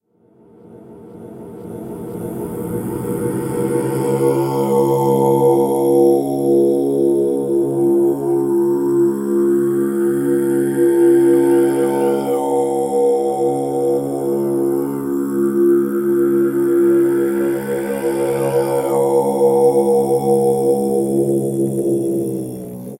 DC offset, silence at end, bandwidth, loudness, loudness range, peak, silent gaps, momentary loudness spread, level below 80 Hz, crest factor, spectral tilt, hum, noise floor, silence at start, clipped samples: under 0.1%; 0.05 s; 16 kHz; -16 LUFS; 4 LU; -2 dBFS; none; 10 LU; -56 dBFS; 14 dB; -7.5 dB/octave; none; -51 dBFS; 0.7 s; under 0.1%